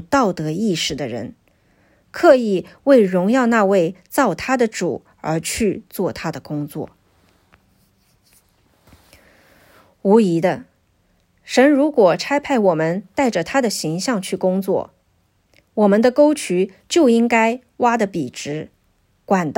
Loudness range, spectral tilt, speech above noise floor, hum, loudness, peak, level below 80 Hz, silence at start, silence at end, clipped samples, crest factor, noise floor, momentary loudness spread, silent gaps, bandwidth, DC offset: 9 LU; -5 dB/octave; 45 dB; none; -18 LUFS; 0 dBFS; -54 dBFS; 0 s; 0.05 s; under 0.1%; 18 dB; -62 dBFS; 14 LU; none; 16.5 kHz; under 0.1%